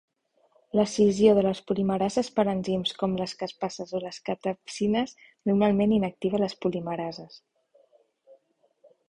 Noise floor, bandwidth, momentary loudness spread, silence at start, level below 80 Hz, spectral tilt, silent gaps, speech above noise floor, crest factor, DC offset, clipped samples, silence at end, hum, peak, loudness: -67 dBFS; 10.5 kHz; 12 LU; 0.75 s; -60 dBFS; -6 dB/octave; none; 41 dB; 20 dB; under 0.1%; under 0.1%; 1.75 s; none; -8 dBFS; -26 LUFS